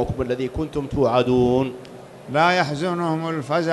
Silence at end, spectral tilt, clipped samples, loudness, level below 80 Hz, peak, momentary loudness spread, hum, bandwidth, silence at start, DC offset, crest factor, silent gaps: 0 s; -6.5 dB/octave; under 0.1%; -21 LUFS; -42 dBFS; -4 dBFS; 10 LU; none; 12 kHz; 0 s; under 0.1%; 16 dB; none